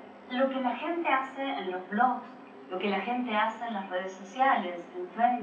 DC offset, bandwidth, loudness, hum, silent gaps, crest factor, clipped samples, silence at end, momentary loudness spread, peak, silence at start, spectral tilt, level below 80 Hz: under 0.1%; 7.4 kHz; -30 LUFS; none; none; 18 dB; under 0.1%; 0 s; 12 LU; -12 dBFS; 0 s; -5.5 dB/octave; under -90 dBFS